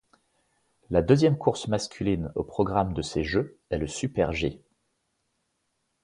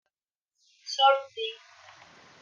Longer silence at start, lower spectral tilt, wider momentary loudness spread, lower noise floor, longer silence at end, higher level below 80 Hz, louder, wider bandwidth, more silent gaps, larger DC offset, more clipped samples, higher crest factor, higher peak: about the same, 0.9 s vs 0.85 s; first, -6 dB/octave vs 1 dB/octave; second, 10 LU vs 23 LU; second, -76 dBFS vs -90 dBFS; first, 1.45 s vs 0.85 s; first, -46 dBFS vs under -90 dBFS; about the same, -27 LUFS vs -26 LUFS; first, 11.5 kHz vs 7.4 kHz; neither; neither; neither; about the same, 22 dB vs 20 dB; first, -6 dBFS vs -10 dBFS